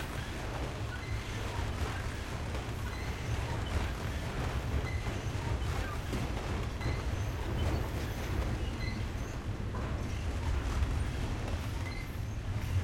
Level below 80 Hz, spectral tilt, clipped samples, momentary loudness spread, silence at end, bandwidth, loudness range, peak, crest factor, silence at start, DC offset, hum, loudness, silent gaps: -38 dBFS; -5.5 dB/octave; under 0.1%; 4 LU; 0 s; 16.5 kHz; 1 LU; -20 dBFS; 16 dB; 0 s; under 0.1%; none; -37 LUFS; none